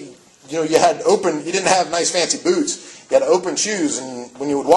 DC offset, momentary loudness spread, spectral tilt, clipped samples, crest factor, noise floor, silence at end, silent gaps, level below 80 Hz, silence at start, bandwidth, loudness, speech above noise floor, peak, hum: under 0.1%; 10 LU; -2.5 dB/octave; under 0.1%; 18 dB; -40 dBFS; 0 s; none; -62 dBFS; 0 s; 12.5 kHz; -18 LUFS; 22 dB; 0 dBFS; none